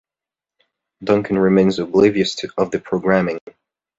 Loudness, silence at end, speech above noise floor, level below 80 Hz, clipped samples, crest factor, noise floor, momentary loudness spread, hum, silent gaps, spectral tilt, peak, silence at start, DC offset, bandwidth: -17 LUFS; 0.6 s; 72 dB; -52 dBFS; under 0.1%; 18 dB; -89 dBFS; 8 LU; none; none; -6.5 dB/octave; -2 dBFS; 1 s; under 0.1%; 7.8 kHz